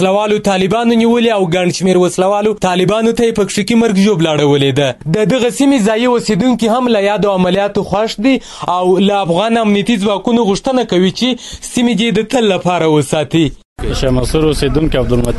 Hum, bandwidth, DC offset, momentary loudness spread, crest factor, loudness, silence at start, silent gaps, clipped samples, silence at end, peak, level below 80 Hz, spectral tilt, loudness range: none; 12 kHz; under 0.1%; 4 LU; 12 dB; -12 LUFS; 0 s; 13.65-13.76 s; under 0.1%; 0 s; 0 dBFS; -30 dBFS; -5.5 dB/octave; 2 LU